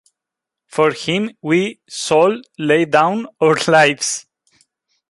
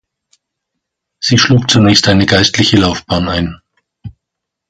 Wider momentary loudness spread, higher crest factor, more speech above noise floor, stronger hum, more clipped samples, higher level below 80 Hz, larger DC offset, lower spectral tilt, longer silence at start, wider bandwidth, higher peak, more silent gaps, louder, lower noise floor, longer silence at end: about the same, 11 LU vs 9 LU; about the same, 16 dB vs 14 dB; about the same, 68 dB vs 68 dB; neither; neither; second, -62 dBFS vs -34 dBFS; neither; about the same, -4 dB/octave vs -4.5 dB/octave; second, 0.75 s vs 1.2 s; first, 11.5 kHz vs 10 kHz; about the same, 0 dBFS vs 0 dBFS; neither; second, -16 LUFS vs -10 LUFS; first, -84 dBFS vs -78 dBFS; first, 0.9 s vs 0.6 s